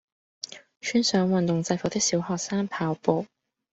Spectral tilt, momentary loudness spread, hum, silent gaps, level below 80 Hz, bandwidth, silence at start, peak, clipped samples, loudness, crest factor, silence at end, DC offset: -4.5 dB/octave; 16 LU; none; none; -64 dBFS; 8.2 kHz; 0.45 s; -6 dBFS; under 0.1%; -26 LUFS; 22 dB; 0.5 s; under 0.1%